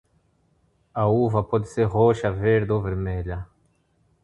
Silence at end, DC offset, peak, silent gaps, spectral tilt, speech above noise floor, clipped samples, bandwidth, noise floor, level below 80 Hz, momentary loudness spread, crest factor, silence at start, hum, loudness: 0.8 s; under 0.1%; -6 dBFS; none; -8.5 dB/octave; 43 dB; under 0.1%; 9.2 kHz; -65 dBFS; -42 dBFS; 14 LU; 18 dB; 0.95 s; none; -23 LUFS